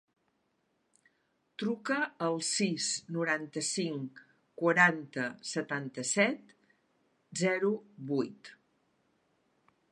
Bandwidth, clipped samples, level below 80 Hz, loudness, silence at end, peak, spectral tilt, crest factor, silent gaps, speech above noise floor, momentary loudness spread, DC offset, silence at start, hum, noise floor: 11.5 kHz; under 0.1%; -84 dBFS; -32 LUFS; 1.4 s; -10 dBFS; -3.5 dB/octave; 26 dB; none; 45 dB; 13 LU; under 0.1%; 1.6 s; none; -77 dBFS